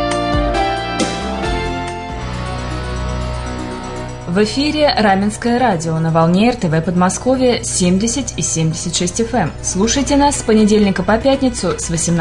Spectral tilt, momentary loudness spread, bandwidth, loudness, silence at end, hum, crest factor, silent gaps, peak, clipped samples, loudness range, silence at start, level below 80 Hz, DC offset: -4.5 dB/octave; 10 LU; 11 kHz; -16 LUFS; 0 s; none; 12 dB; none; -2 dBFS; under 0.1%; 7 LU; 0 s; -30 dBFS; under 0.1%